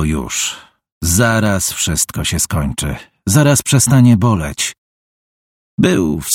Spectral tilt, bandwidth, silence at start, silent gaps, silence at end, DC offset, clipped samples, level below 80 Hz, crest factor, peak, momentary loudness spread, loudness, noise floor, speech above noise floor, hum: -4.5 dB/octave; 17 kHz; 0 s; 0.92-1.01 s, 4.78-5.78 s; 0 s; under 0.1%; under 0.1%; -32 dBFS; 14 dB; 0 dBFS; 11 LU; -14 LUFS; under -90 dBFS; over 76 dB; none